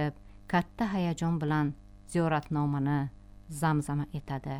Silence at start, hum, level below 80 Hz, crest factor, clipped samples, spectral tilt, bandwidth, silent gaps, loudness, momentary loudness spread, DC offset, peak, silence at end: 0 s; 50 Hz at -60 dBFS; -52 dBFS; 18 dB; under 0.1%; -7 dB/octave; 13 kHz; none; -31 LUFS; 7 LU; under 0.1%; -12 dBFS; 0 s